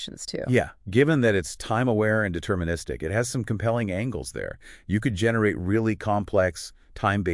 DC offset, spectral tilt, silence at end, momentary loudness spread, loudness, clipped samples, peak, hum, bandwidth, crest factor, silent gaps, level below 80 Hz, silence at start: under 0.1%; -6 dB/octave; 0 s; 10 LU; -25 LUFS; under 0.1%; -6 dBFS; none; 12 kHz; 18 dB; none; -48 dBFS; 0 s